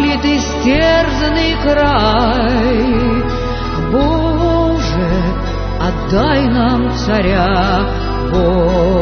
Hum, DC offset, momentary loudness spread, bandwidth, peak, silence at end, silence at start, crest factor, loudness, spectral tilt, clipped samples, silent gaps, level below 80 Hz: none; under 0.1%; 6 LU; 6.6 kHz; 0 dBFS; 0 s; 0 s; 12 dB; -14 LUFS; -6.5 dB/octave; under 0.1%; none; -20 dBFS